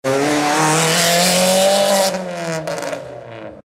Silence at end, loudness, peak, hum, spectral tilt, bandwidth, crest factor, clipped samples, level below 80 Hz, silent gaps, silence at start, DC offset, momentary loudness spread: 0.05 s; -15 LUFS; -2 dBFS; none; -3 dB/octave; 16 kHz; 14 dB; under 0.1%; -58 dBFS; none; 0.05 s; under 0.1%; 16 LU